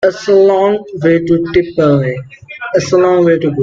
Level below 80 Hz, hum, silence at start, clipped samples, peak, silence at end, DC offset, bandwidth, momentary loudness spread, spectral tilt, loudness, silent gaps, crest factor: -46 dBFS; none; 0 s; under 0.1%; 0 dBFS; 0 s; under 0.1%; 7.6 kHz; 10 LU; -7 dB/octave; -11 LUFS; none; 12 dB